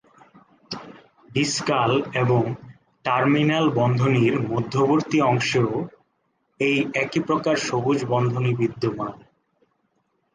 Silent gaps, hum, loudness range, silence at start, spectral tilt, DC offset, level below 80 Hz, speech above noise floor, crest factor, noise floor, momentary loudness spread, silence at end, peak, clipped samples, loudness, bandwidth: none; none; 4 LU; 0.7 s; -6 dB/octave; under 0.1%; -60 dBFS; 49 dB; 16 dB; -71 dBFS; 12 LU; 1.2 s; -8 dBFS; under 0.1%; -22 LUFS; 9.8 kHz